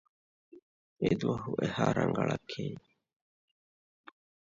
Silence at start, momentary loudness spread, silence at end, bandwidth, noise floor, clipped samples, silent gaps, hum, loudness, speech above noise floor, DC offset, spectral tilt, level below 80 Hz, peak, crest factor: 0.55 s; 10 LU; 1.75 s; 7.6 kHz; under -90 dBFS; under 0.1%; 0.62-0.96 s; none; -32 LUFS; over 59 dB; under 0.1%; -7 dB/octave; -62 dBFS; -14 dBFS; 22 dB